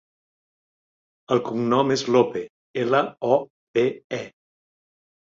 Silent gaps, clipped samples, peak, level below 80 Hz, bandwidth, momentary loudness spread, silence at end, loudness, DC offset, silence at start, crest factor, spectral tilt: 2.50-2.74 s, 3.50-3.74 s, 4.04-4.10 s; under 0.1%; -6 dBFS; -66 dBFS; 7.6 kHz; 12 LU; 1.05 s; -23 LUFS; under 0.1%; 1.3 s; 20 dB; -5.5 dB/octave